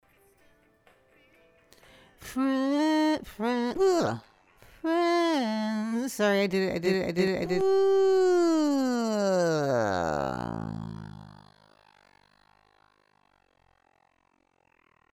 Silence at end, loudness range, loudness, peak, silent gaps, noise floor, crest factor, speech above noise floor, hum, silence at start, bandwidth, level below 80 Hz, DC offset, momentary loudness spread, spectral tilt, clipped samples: 3.8 s; 8 LU; -26 LUFS; -12 dBFS; none; -70 dBFS; 16 dB; 45 dB; none; 2.2 s; 15.5 kHz; -60 dBFS; under 0.1%; 13 LU; -5.5 dB/octave; under 0.1%